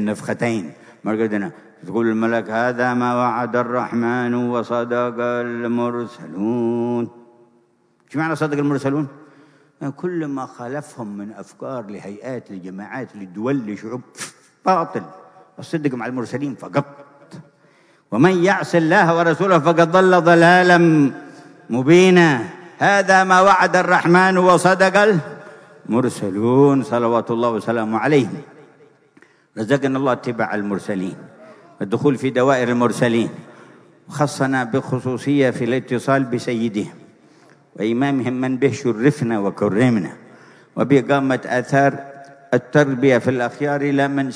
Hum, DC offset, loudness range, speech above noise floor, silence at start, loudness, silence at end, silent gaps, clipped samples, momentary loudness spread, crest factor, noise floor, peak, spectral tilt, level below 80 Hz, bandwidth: none; under 0.1%; 11 LU; 42 dB; 0 s; -18 LUFS; 0 s; none; under 0.1%; 18 LU; 16 dB; -59 dBFS; -2 dBFS; -6 dB/octave; -66 dBFS; 11 kHz